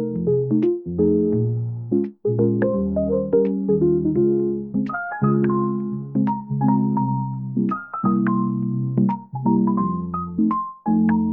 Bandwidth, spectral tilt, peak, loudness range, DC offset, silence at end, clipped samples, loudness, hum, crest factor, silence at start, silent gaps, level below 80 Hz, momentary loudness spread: 3 kHz; -13 dB/octave; -6 dBFS; 2 LU; 0.1%; 0 s; under 0.1%; -21 LUFS; none; 14 dB; 0 s; none; -52 dBFS; 6 LU